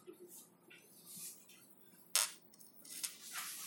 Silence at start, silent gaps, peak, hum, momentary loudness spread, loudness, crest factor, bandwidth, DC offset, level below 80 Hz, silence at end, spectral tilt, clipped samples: 0 s; none; -10 dBFS; none; 25 LU; -40 LUFS; 36 dB; 17 kHz; under 0.1%; under -90 dBFS; 0 s; 1.5 dB/octave; under 0.1%